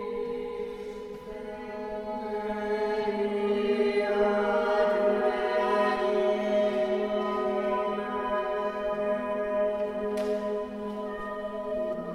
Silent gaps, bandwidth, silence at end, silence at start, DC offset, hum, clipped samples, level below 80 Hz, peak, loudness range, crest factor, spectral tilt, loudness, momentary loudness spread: none; 12 kHz; 0 s; 0 s; under 0.1%; none; under 0.1%; -56 dBFS; -12 dBFS; 5 LU; 16 dB; -6 dB/octave; -29 LUFS; 11 LU